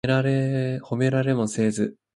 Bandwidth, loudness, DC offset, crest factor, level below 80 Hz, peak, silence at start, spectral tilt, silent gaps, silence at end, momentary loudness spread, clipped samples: 11.5 kHz; -24 LUFS; under 0.1%; 14 dB; -58 dBFS; -8 dBFS; 0.05 s; -6.5 dB/octave; none; 0.25 s; 5 LU; under 0.1%